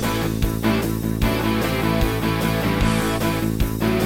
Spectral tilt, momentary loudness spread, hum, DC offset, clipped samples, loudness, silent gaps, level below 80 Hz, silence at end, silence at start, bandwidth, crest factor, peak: -5.5 dB/octave; 2 LU; none; under 0.1%; under 0.1%; -21 LUFS; none; -28 dBFS; 0 s; 0 s; 17 kHz; 14 dB; -6 dBFS